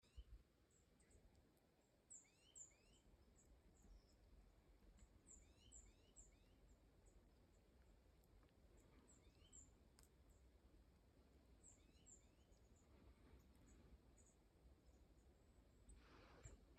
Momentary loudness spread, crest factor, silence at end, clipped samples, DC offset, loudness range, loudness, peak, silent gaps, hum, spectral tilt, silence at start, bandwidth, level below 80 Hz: 6 LU; 30 dB; 0 s; under 0.1%; under 0.1%; 1 LU; -67 LUFS; -40 dBFS; none; none; -3.5 dB/octave; 0 s; 8.8 kHz; -74 dBFS